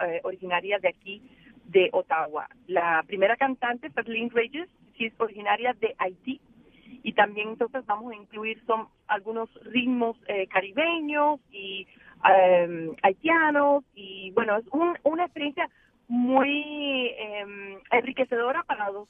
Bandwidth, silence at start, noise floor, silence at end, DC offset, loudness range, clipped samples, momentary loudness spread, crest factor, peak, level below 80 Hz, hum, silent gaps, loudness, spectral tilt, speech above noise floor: 3.8 kHz; 0 s; -51 dBFS; 0.05 s; under 0.1%; 6 LU; under 0.1%; 14 LU; 22 dB; -4 dBFS; -70 dBFS; none; none; -26 LUFS; -7.5 dB/octave; 25 dB